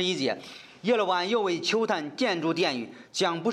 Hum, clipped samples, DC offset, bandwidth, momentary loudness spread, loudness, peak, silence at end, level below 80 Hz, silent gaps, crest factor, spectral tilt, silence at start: none; under 0.1%; under 0.1%; 13 kHz; 9 LU; -27 LUFS; -10 dBFS; 0 s; -78 dBFS; none; 16 dB; -4 dB/octave; 0 s